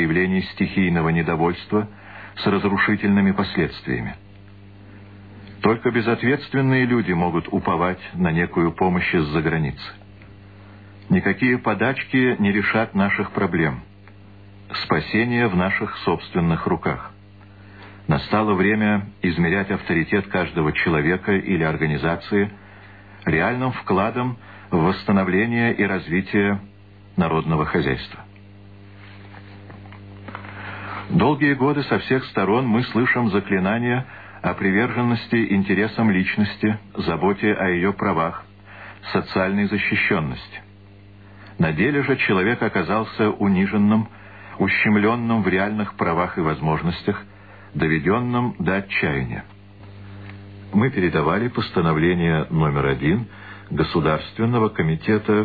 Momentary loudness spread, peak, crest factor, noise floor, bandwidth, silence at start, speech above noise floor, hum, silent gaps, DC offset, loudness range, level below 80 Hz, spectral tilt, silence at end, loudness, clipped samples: 15 LU; -2 dBFS; 20 dB; -45 dBFS; 4.9 kHz; 0 s; 25 dB; 50 Hz at -45 dBFS; none; 0.2%; 3 LU; -46 dBFS; -10 dB/octave; 0 s; -21 LUFS; under 0.1%